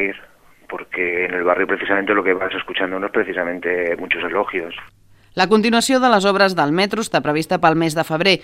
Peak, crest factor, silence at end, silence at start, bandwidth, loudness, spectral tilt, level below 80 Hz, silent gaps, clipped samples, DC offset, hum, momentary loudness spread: 0 dBFS; 18 dB; 0 s; 0 s; 16 kHz; -18 LUFS; -4.5 dB/octave; -56 dBFS; none; under 0.1%; under 0.1%; none; 10 LU